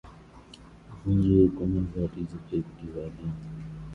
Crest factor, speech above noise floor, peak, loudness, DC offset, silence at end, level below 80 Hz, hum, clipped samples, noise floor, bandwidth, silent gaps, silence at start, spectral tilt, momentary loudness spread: 20 dB; 23 dB; -8 dBFS; -28 LUFS; under 0.1%; 0 s; -44 dBFS; none; under 0.1%; -50 dBFS; 7.2 kHz; none; 0.05 s; -10.5 dB/octave; 17 LU